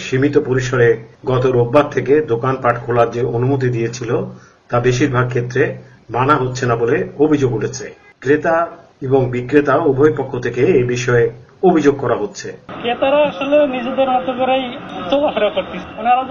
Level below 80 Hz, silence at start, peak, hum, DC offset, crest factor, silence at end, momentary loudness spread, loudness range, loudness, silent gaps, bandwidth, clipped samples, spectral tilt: -44 dBFS; 0 s; 0 dBFS; none; under 0.1%; 16 dB; 0 s; 9 LU; 2 LU; -16 LUFS; none; 7.4 kHz; under 0.1%; -6.5 dB/octave